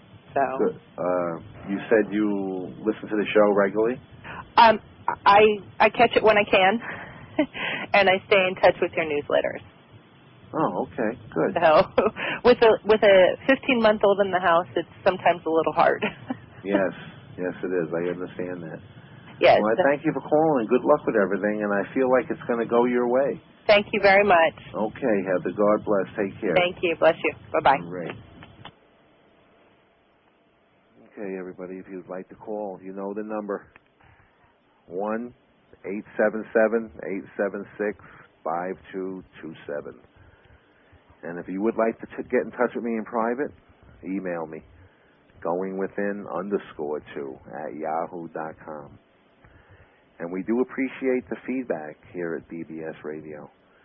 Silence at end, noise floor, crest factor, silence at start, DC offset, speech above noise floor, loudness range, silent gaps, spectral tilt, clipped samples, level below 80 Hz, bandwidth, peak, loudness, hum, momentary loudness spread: 0.4 s; -62 dBFS; 20 dB; 0.15 s; under 0.1%; 39 dB; 15 LU; none; -9.5 dB/octave; under 0.1%; -58 dBFS; 5.8 kHz; -6 dBFS; -23 LUFS; none; 18 LU